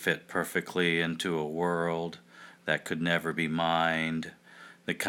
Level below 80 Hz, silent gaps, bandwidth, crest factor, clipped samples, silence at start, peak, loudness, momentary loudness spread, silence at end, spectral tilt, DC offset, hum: -66 dBFS; none; 17.5 kHz; 20 dB; under 0.1%; 0 s; -10 dBFS; -30 LUFS; 12 LU; 0 s; -4.5 dB/octave; under 0.1%; none